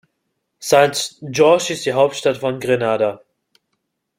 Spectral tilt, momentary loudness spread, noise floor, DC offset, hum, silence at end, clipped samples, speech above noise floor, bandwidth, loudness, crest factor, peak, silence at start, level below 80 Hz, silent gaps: -4 dB/octave; 9 LU; -73 dBFS; under 0.1%; none; 1 s; under 0.1%; 57 dB; 16.5 kHz; -17 LUFS; 18 dB; -2 dBFS; 0.6 s; -62 dBFS; none